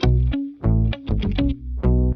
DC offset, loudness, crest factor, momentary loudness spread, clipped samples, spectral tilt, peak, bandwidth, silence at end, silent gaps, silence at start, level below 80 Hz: under 0.1%; -22 LUFS; 14 dB; 4 LU; under 0.1%; -9 dB/octave; -6 dBFS; 6.2 kHz; 0 s; none; 0 s; -22 dBFS